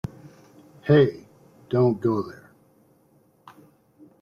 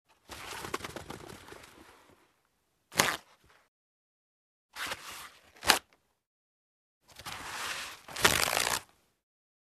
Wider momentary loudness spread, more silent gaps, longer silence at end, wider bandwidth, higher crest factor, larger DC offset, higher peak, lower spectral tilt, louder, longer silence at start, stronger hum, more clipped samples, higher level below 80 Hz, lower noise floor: second, 19 LU vs 22 LU; second, none vs 3.68-4.69 s, 6.26-7.01 s; first, 1.9 s vs 0.9 s; second, 7 kHz vs 14 kHz; second, 20 dB vs 34 dB; neither; second, -8 dBFS vs -2 dBFS; first, -9 dB/octave vs -1 dB/octave; first, -22 LUFS vs -31 LUFS; first, 0.85 s vs 0.3 s; neither; neither; about the same, -60 dBFS vs -62 dBFS; second, -61 dBFS vs -76 dBFS